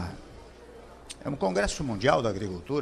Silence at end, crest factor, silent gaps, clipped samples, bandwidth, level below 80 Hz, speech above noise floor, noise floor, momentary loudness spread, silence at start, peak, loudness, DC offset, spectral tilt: 0 s; 22 dB; none; under 0.1%; 13 kHz; -46 dBFS; 21 dB; -48 dBFS; 24 LU; 0 s; -8 dBFS; -28 LUFS; under 0.1%; -5 dB/octave